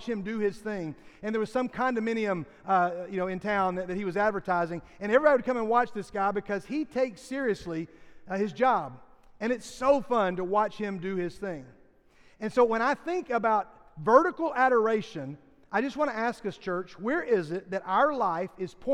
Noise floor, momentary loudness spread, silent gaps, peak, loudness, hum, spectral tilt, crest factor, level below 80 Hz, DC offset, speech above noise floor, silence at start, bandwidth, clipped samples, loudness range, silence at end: -59 dBFS; 12 LU; none; -6 dBFS; -28 LUFS; none; -6 dB/octave; 22 dB; -60 dBFS; under 0.1%; 31 dB; 0 s; 11.5 kHz; under 0.1%; 4 LU; 0 s